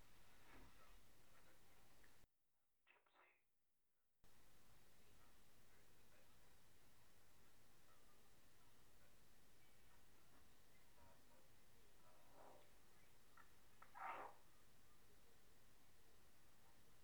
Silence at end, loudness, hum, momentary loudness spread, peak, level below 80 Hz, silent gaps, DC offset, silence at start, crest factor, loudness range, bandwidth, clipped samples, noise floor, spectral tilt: 0 s; -60 LUFS; none; 14 LU; -40 dBFS; -82 dBFS; none; under 0.1%; 0 s; 26 dB; 0 LU; over 20 kHz; under 0.1%; -89 dBFS; -3 dB/octave